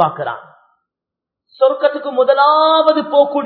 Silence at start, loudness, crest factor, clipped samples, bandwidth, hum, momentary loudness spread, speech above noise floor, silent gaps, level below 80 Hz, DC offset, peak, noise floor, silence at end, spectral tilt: 0 s; -13 LUFS; 14 dB; under 0.1%; 5.2 kHz; none; 13 LU; 71 dB; none; -72 dBFS; under 0.1%; 0 dBFS; -84 dBFS; 0 s; -7.5 dB/octave